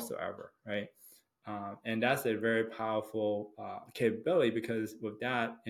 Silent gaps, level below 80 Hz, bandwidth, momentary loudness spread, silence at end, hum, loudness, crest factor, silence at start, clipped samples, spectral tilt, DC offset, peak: none; -78 dBFS; 17 kHz; 14 LU; 0 s; none; -34 LUFS; 20 dB; 0 s; under 0.1%; -5.5 dB/octave; under 0.1%; -16 dBFS